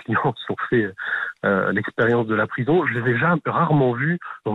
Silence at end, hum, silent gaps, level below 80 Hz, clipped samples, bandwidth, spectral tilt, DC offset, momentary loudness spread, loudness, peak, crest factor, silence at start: 0 s; none; none; -60 dBFS; under 0.1%; 5.6 kHz; -9 dB/octave; under 0.1%; 6 LU; -21 LUFS; -8 dBFS; 12 dB; 0.1 s